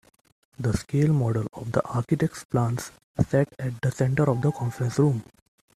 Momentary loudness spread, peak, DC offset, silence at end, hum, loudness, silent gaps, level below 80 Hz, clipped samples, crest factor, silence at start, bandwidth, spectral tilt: 6 LU; -6 dBFS; under 0.1%; 0.55 s; none; -26 LUFS; 2.45-2.49 s, 3.04-3.14 s; -52 dBFS; under 0.1%; 18 dB; 0.6 s; 13.5 kHz; -7.5 dB/octave